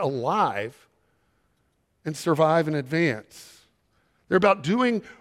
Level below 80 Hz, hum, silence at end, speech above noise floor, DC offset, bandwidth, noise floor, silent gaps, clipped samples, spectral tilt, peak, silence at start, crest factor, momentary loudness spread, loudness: -66 dBFS; none; 0.1 s; 46 dB; under 0.1%; 15.5 kHz; -70 dBFS; none; under 0.1%; -6 dB/octave; -6 dBFS; 0 s; 20 dB; 14 LU; -24 LUFS